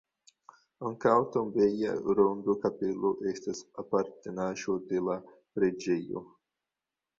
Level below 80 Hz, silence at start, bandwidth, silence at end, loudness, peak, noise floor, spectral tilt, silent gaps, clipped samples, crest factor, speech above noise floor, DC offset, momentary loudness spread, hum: -68 dBFS; 0.8 s; 7.6 kHz; 0.95 s; -31 LUFS; -10 dBFS; -90 dBFS; -6.5 dB/octave; none; under 0.1%; 20 dB; 60 dB; under 0.1%; 12 LU; none